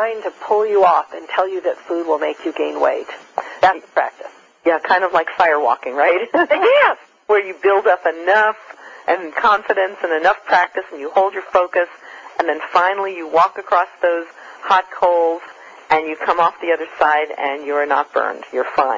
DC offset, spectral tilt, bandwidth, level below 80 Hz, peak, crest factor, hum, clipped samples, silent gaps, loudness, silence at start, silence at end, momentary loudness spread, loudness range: under 0.1%; -4 dB/octave; 7.6 kHz; -62 dBFS; -2 dBFS; 16 dB; none; under 0.1%; none; -17 LUFS; 0 s; 0 s; 10 LU; 3 LU